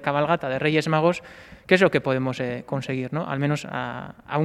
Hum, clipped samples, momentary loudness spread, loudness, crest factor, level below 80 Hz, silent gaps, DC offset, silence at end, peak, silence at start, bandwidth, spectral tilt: none; under 0.1%; 13 LU; -24 LUFS; 22 dB; -58 dBFS; none; under 0.1%; 0 s; 0 dBFS; 0 s; 13 kHz; -6.5 dB/octave